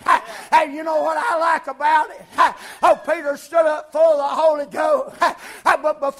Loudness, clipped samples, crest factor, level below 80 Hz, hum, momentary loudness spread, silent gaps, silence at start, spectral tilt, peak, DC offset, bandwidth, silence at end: -19 LUFS; under 0.1%; 16 dB; -62 dBFS; none; 4 LU; none; 0.05 s; -2.5 dB/octave; -2 dBFS; under 0.1%; 15 kHz; 0.05 s